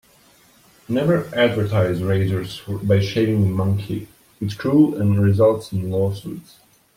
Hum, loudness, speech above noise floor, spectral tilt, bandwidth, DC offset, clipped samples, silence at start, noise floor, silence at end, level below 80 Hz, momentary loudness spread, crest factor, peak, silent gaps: none; -20 LUFS; 35 dB; -8 dB/octave; 16 kHz; under 0.1%; under 0.1%; 0.9 s; -53 dBFS; 0.55 s; -52 dBFS; 13 LU; 16 dB; -4 dBFS; none